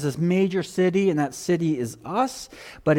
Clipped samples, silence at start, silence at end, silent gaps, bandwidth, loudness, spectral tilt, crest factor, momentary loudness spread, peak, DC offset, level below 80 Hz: under 0.1%; 0 s; 0 s; none; 16.5 kHz; -24 LUFS; -6.5 dB/octave; 14 dB; 7 LU; -8 dBFS; under 0.1%; -58 dBFS